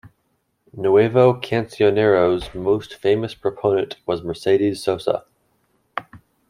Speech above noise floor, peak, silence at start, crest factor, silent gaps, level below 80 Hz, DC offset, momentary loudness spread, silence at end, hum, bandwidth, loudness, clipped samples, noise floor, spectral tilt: 50 dB; -2 dBFS; 0.75 s; 18 dB; none; -52 dBFS; under 0.1%; 10 LU; 0.3 s; none; 12 kHz; -19 LUFS; under 0.1%; -69 dBFS; -7 dB/octave